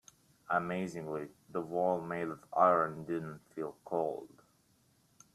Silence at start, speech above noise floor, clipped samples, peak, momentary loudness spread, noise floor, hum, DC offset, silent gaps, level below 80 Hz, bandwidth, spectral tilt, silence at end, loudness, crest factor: 0.5 s; 36 dB; under 0.1%; -12 dBFS; 15 LU; -70 dBFS; none; under 0.1%; none; -76 dBFS; 14 kHz; -7 dB/octave; 1.1 s; -35 LUFS; 22 dB